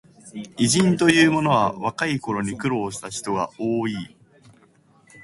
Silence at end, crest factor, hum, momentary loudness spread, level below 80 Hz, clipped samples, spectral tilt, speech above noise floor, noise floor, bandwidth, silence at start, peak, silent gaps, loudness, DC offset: 0 s; 20 dB; none; 17 LU; -56 dBFS; under 0.1%; -4.5 dB/octave; 35 dB; -57 dBFS; 11.5 kHz; 0.25 s; -2 dBFS; none; -21 LUFS; under 0.1%